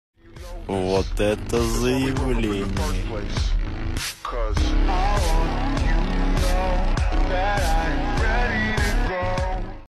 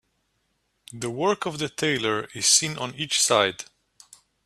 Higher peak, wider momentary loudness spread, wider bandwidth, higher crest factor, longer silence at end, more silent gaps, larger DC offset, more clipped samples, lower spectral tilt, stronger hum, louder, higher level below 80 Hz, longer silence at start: second, -8 dBFS vs -4 dBFS; second, 6 LU vs 14 LU; about the same, 13.5 kHz vs 14.5 kHz; second, 12 dB vs 22 dB; second, 0.05 s vs 0.85 s; neither; neither; neither; first, -5.5 dB/octave vs -2 dB/octave; neither; about the same, -24 LUFS vs -23 LUFS; first, -24 dBFS vs -66 dBFS; second, 0.25 s vs 0.9 s